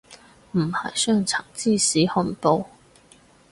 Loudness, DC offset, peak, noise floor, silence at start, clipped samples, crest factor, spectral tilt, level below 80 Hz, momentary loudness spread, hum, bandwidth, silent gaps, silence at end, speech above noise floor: -22 LUFS; under 0.1%; -4 dBFS; -54 dBFS; 0.1 s; under 0.1%; 20 dB; -4 dB/octave; -58 dBFS; 7 LU; none; 11.5 kHz; none; 0.85 s; 32 dB